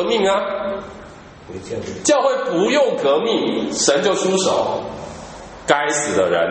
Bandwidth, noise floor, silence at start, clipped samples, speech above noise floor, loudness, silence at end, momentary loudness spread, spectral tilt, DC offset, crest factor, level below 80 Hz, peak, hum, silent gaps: 8.8 kHz; -39 dBFS; 0 s; under 0.1%; 21 dB; -18 LUFS; 0 s; 17 LU; -3 dB/octave; under 0.1%; 18 dB; -50 dBFS; 0 dBFS; none; none